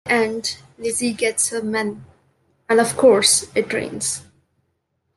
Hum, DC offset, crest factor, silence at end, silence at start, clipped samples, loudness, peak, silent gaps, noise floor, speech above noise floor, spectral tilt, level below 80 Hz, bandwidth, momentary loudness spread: none; under 0.1%; 18 dB; 0.95 s; 0.05 s; under 0.1%; -19 LUFS; -2 dBFS; none; -71 dBFS; 52 dB; -2 dB/octave; -64 dBFS; 12.5 kHz; 13 LU